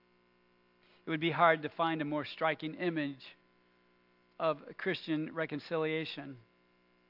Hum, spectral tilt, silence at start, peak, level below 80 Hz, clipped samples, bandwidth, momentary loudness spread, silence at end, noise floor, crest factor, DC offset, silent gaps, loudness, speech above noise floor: 60 Hz at -70 dBFS; -8 dB/octave; 1.05 s; -12 dBFS; -84 dBFS; under 0.1%; 5.8 kHz; 18 LU; 0.7 s; -70 dBFS; 24 dB; under 0.1%; none; -34 LUFS; 35 dB